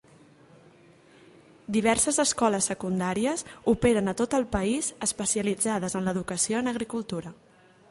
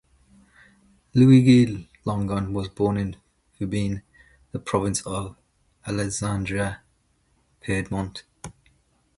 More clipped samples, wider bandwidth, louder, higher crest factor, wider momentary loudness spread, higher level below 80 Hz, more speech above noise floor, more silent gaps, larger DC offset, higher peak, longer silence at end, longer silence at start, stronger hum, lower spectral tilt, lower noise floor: neither; about the same, 11.5 kHz vs 11.5 kHz; second, -26 LUFS vs -23 LUFS; about the same, 20 dB vs 20 dB; second, 9 LU vs 23 LU; about the same, -52 dBFS vs -48 dBFS; second, 29 dB vs 44 dB; neither; neither; second, -8 dBFS vs -4 dBFS; about the same, 0.6 s vs 0.65 s; first, 1.7 s vs 1.15 s; neither; second, -4 dB/octave vs -6.5 dB/octave; second, -56 dBFS vs -66 dBFS